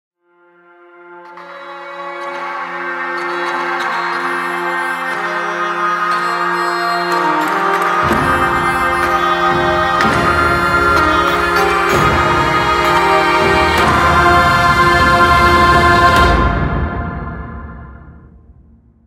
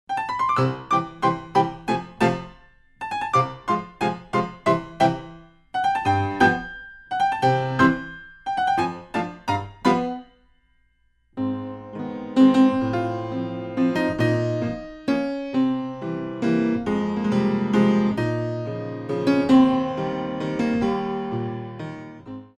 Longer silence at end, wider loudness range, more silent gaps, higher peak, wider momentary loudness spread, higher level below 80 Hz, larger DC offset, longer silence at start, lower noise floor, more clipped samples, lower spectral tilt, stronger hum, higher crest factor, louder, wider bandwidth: first, 0.85 s vs 0.15 s; first, 10 LU vs 3 LU; neither; first, 0 dBFS vs -4 dBFS; about the same, 14 LU vs 13 LU; first, -28 dBFS vs -52 dBFS; neither; first, 1.05 s vs 0.1 s; second, -51 dBFS vs -63 dBFS; neither; second, -5 dB/octave vs -7 dB/octave; neither; second, 14 dB vs 20 dB; first, -13 LUFS vs -23 LUFS; first, 16 kHz vs 11.5 kHz